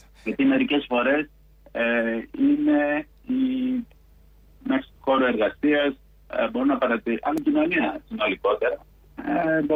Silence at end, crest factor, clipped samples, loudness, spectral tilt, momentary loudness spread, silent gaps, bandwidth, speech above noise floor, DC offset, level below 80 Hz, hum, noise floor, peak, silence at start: 0 s; 12 dB; under 0.1%; -24 LUFS; -6.5 dB/octave; 9 LU; none; 4.8 kHz; 30 dB; under 0.1%; -54 dBFS; none; -53 dBFS; -12 dBFS; 0.25 s